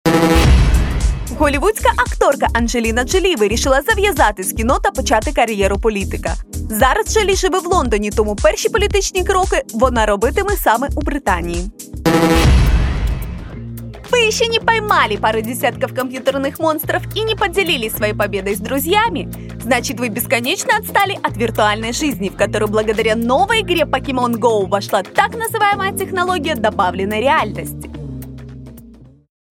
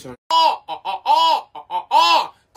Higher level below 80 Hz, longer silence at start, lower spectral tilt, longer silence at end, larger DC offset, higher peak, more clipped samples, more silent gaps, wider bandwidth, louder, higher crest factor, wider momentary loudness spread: first, -24 dBFS vs -66 dBFS; about the same, 0.05 s vs 0.05 s; first, -4.5 dB/octave vs -1 dB/octave; first, 0.5 s vs 0.25 s; neither; about the same, 0 dBFS vs -2 dBFS; neither; second, none vs 0.18-0.30 s; about the same, 17 kHz vs 15.5 kHz; about the same, -16 LUFS vs -17 LUFS; about the same, 16 dB vs 16 dB; second, 9 LU vs 13 LU